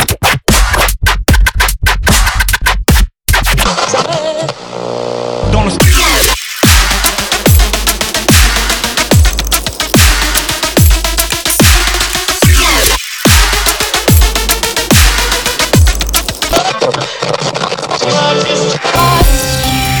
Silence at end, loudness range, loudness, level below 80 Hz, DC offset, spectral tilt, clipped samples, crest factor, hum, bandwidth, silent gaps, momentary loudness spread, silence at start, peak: 0 s; 3 LU; -10 LUFS; -14 dBFS; under 0.1%; -3 dB/octave; 0.3%; 10 dB; none; over 20 kHz; none; 7 LU; 0 s; 0 dBFS